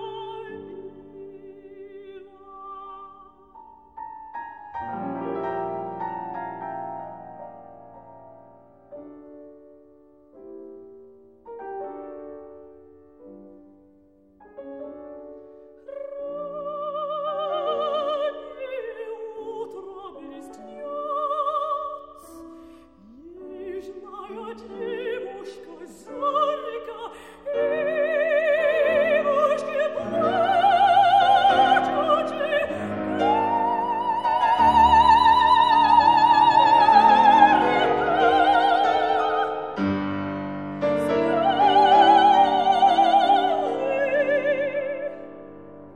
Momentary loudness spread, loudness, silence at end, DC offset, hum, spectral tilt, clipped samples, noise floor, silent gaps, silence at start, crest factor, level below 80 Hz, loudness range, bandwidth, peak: 25 LU; -20 LUFS; 0.05 s; under 0.1%; none; -5 dB/octave; under 0.1%; -56 dBFS; none; 0 s; 22 dB; -54 dBFS; 24 LU; 10.5 kHz; -2 dBFS